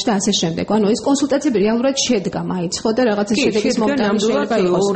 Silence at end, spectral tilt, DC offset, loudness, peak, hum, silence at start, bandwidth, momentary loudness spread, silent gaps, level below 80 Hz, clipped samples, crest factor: 0 s; -4.5 dB/octave; under 0.1%; -17 LUFS; -4 dBFS; none; 0 s; 8.8 kHz; 3 LU; none; -50 dBFS; under 0.1%; 12 dB